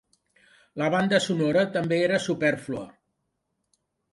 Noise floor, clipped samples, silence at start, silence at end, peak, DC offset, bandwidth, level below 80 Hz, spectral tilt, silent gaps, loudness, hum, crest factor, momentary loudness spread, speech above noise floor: -78 dBFS; under 0.1%; 0.75 s; 1.25 s; -6 dBFS; under 0.1%; 11.5 kHz; -66 dBFS; -5.5 dB/octave; none; -24 LUFS; none; 20 dB; 13 LU; 54 dB